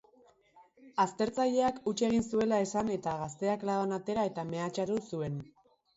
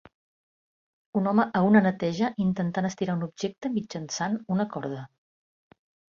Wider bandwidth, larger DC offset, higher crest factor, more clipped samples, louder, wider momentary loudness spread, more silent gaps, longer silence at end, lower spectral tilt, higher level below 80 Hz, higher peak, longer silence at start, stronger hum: about the same, 8 kHz vs 7.4 kHz; neither; second, 16 dB vs 22 dB; neither; second, -32 LUFS vs -27 LUFS; second, 7 LU vs 12 LU; neither; second, 0.5 s vs 1.05 s; about the same, -5.5 dB/octave vs -6.5 dB/octave; about the same, -66 dBFS vs -66 dBFS; second, -16 dBFS vs -6 dBFS; second, 0.55 s vs 1.15 s; neither